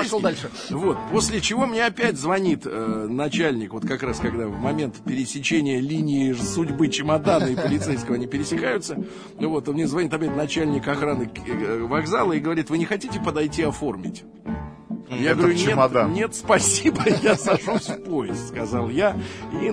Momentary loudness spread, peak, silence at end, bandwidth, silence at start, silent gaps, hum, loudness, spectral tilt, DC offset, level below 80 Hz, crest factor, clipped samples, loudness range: 10 LU; -4 dBFS; 0 s; 11 kHz; 0 s; none; none; -23 LUFS; -4.5 dB/octave; under 0.1%; -48 dBFS; 20 dB; under 0.1%; 5 LU